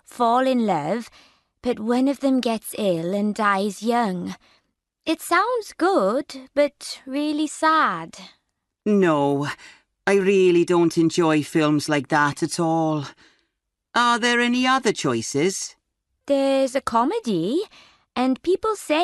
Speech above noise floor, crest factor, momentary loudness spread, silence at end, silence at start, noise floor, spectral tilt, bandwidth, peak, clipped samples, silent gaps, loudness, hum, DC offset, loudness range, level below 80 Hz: 57 dB; 16 dB; 11 LU; 0 s; 0.15 s; -78 dBFS; -5 dB/octave; 12 kHz; -6 dBFS; under 0.1%; none; -21 LUFS; none; under 0.1%; 4 LU; -64 dBFS